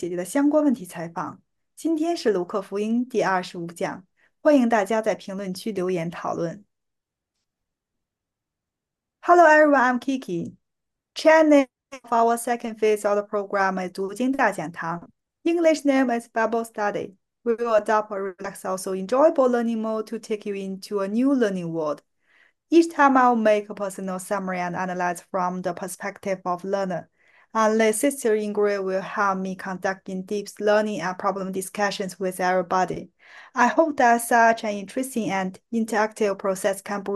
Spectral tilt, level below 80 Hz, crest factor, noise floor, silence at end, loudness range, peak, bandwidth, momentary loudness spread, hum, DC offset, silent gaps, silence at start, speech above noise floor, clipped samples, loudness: -5 dB/octave; -70 dBFS; 20 dB; -85 dBFS; 0 s; 5 LU; -4 dBFS; 12.5 kHz; 13 LU; none; under 0.1%; none; 0 s; 63 dB; under 0.1%; -23 LUFS